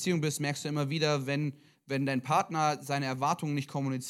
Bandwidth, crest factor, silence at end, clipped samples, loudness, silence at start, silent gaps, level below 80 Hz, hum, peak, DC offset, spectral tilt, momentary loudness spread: 15.5 kHz; 18 dB; 0 s; under 0.1%; -31 LUFS; 0 s; none; -78 dBFS; none; -14 dBFS; under 0.1%; -5 dB/octave; 5 LU